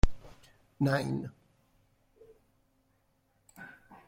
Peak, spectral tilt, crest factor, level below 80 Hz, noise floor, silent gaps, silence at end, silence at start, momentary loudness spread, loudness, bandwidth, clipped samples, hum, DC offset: -10 dBFS; -7 dB/octave; 24 dB; -40 dBFS; -73 dBFS; none; 0.4 s; 0.05 s; 24 LU; -33 LUFS; 15 kHz; under 0.1%; none; under 0.1%